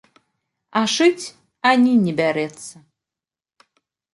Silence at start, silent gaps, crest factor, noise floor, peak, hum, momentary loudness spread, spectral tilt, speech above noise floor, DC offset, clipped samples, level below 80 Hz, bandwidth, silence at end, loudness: 0.75 s; none; 20 dB; -90 dBFS; -2 dBFS; none; 19 LU; -4.5 dB/octave; 72 dB; under 0.1%; under 0.1%; -68 dBFS; 11.5 kHz; 1.45 s; -18 LUFS